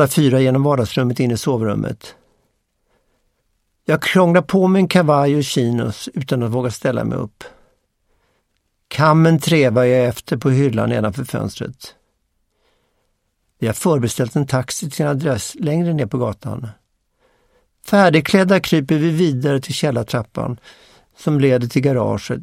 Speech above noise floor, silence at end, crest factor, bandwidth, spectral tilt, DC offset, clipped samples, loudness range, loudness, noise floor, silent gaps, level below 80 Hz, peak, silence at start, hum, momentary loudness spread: 52 dB; 0 s; 18 dB; 16 kHz; -6 dB/octave; under 0.1%; under 0.1%; 7 LU; -17 LUFS; -68 dBFS; none; -52 dBFS; 0 dBFS; 0 s; none; 13 LU